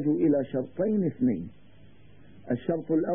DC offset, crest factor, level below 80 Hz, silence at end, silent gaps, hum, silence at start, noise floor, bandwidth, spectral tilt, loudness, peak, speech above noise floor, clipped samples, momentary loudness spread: 0.3%; 14 dB; -62 dBFS; 0 s; none; none; 0 s; -55 dBFS; 3.6 kHz; -12.5 dB/octave; -28 LUFS; -14 dBFS; 29 dB; under 0.1%; 9 LU